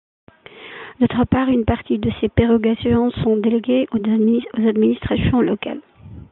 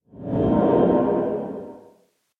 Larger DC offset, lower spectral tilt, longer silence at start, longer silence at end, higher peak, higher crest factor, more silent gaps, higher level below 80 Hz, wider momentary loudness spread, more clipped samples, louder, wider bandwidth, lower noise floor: neither; about the same, -11 dB/octave vs -10.5 dB/octave; first, 0.55 s vs 0.15 s; second, 0.05 s vs 0.6 s; first, -2 dBFS vs -6 dBFS; about the same, 16 dB vs 16 dB; neither; first, -40 dBFS vs -46 dBFS; second, 8 LU vs 16 LU; neither; first, -18 LUFS vs -21 LUFS; about the same, 4.1 kHz vs 4.1 kHz; second, -39 dBFS vs -60 dBFS